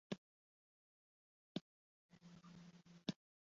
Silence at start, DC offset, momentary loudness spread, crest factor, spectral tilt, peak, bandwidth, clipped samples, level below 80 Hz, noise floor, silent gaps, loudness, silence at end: 0.1 s; under 0.1%; 13 LU; 30 dB; -5 dB/octave; -28 dBFS; 7.4 kHz; under 0.1%; -88 dBFS; under -90 dBFS; 0.18-1.55 s, 1.61-2.09 s; -54 LUFS; 0.35 s